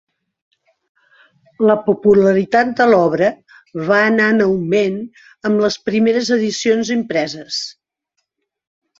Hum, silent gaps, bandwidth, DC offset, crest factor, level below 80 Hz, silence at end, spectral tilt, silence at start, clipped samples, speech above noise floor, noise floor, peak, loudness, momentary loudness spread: none; none; 7.8 kHz; under 0.1%; 16 dB; -56 dBFS; 1.3 s; -5 dB/octave; 1.6 s; under 0.1%; 58 dB; -73 dBFS; -2 dBFS; -15 LUFS; 11 LU